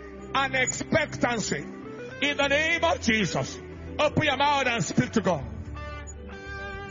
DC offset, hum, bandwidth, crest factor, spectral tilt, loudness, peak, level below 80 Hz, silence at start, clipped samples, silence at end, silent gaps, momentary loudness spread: under 0.1%; none; 7.6 kHz; 18 dB; -4 dB/octave; -25 LUFS; -10 dBFS; -48 dBFS; 0 s; under 0.1%; 0 s; none; 16 LU